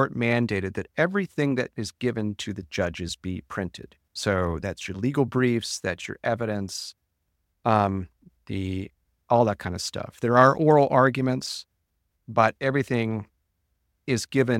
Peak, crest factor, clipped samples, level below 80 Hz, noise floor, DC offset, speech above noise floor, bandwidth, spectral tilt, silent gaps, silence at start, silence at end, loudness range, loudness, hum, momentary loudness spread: -2 dBFS; 22 dB; under 0.1%; -54 dBFS; -75 dBFS; under 0.1%; 51 dB; 16 kHz; -5.5 dB/octave; none; 0 s; 0 s; 7 LU; -25 LUFS; none; 14 LU